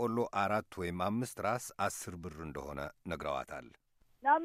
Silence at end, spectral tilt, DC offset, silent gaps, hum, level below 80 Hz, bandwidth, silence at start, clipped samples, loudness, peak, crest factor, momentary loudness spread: 0 s; -5 dB/octave; under 0.1%; none; none; -60 dBFS; 15.5 kHz; 0 s; under 0.1%; -37 LUFS; -16 dBFS; 20 dB; 11 LU